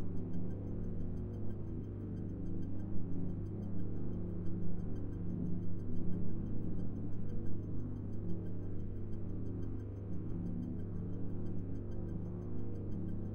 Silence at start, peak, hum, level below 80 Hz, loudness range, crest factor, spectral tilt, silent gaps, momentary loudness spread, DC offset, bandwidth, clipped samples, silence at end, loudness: 0 s; -22 dBFS; none; -46 dBFS; 1 LU; 14 dB; -11 dB/octave; none; 3 LU; 0.7%; 3.2 kHz; under 0.1%; 0 s; -43 LUFS